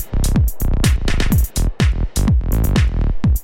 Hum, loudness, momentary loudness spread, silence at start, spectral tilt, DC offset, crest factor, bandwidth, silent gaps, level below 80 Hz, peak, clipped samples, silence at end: none; -18 LUFS; 2 LU; 0 s; -5.5 dB/octave; under 0.1%; 14 dB; 17 kHz; none; -16 dBFS; -2 dBFS; under 0.1%; 0 s